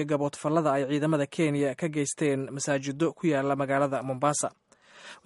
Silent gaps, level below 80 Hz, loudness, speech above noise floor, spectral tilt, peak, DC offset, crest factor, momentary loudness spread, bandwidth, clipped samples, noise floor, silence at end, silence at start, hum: none; -70 dBFS; -28 LUFS; 24 dB; -5.5 dB/octave; -10 dBFS; under 0.1%; 16 dB; 4 LU; 11.5 kHz; under 0.1%; -51 dBFS; 0.1 s; 0 s; none